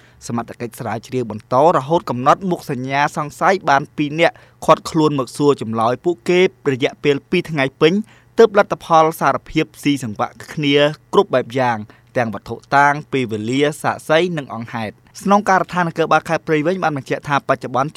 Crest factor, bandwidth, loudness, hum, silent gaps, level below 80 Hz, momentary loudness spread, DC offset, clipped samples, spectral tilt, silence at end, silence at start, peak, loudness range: 18 dB; 15 kHz; -17 LUFS; none; none; -54 dBFS; 11 LU; under 0.1%; under 0.1%; -5.5 dB/octave; 0.05 s; 0.25 s; 0 dBFS; 2 LU